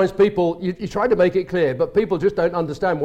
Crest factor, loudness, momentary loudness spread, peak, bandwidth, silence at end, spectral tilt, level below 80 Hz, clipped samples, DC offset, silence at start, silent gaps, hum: 12 dB; -20 LUFS; 5 LU; -6 dBFS; 8.8 kHz; 0 s; -7.5 dB/octave; -46 dBFS; under 0.1%; under 0.1%; 0 s; none; none